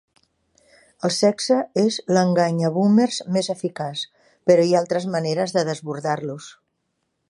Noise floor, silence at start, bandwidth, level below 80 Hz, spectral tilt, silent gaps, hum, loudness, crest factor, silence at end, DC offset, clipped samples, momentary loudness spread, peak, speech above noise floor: -74 dBFS; 1.05 s; 11.5 kHz; -70 dBFS; -5.5 dB/octave; none; none; -21 LUFS; 18 dB; 0.8 s; under 0.1%; under 0.1%; 10 LU; -2 dBFS; 54 dB